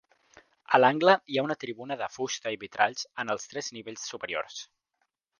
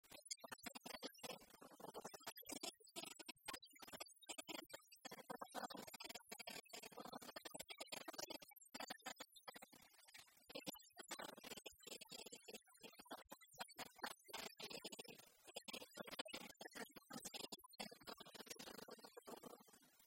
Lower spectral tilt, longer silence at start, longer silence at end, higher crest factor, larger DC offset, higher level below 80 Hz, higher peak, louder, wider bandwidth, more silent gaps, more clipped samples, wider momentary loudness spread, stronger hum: first, -3.5 dB/octave vs -1.5 dB/octave; first, 0.7 s vs 0.05 s; first, 0.75 s vs 0 s; about the same, 26 dB vs 24 dB; neither; first, -76 dBFS vs -88 dBFS; first, -4 dBFS vs -34 dBFS; first, -28 LUFS vs -55 LUFS; second, 10 kHz vs 16 kHz; second, none vs 16.21-16.25 s; neither; first, 15 LU vs 8 LU; neither